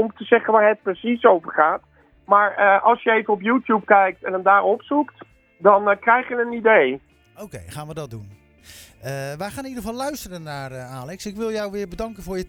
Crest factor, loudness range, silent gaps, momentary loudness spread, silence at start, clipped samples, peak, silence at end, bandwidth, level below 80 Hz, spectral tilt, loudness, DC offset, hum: 20 dB; 14 LU; none; 18 LU; 0 s; under 0.1%; 0 dBFS; 0 s; 18.5 kHz; -52 dBFS; -5.5 dB/octave; -19 LUFS; under 0.1%; none